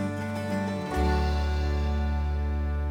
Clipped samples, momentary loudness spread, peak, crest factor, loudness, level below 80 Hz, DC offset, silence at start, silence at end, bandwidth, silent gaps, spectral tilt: under 0.1%; 4 LU; -14 dBFS; 12 dB; -29 LUFS; -28 dBFS; under 0.1%; 0 s; 0 s; 10 kHz; none; -7 dB/octave